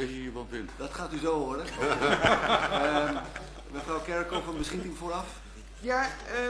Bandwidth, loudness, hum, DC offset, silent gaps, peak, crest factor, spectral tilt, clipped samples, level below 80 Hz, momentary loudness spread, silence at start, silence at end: 11 kHz; -30 LUFS; none; under 0.1%; none; -6 dBFS; 24 dB; -4 dB/octave; under 0.1%; -46 dBFS; 15 LU; 0 s; 0 s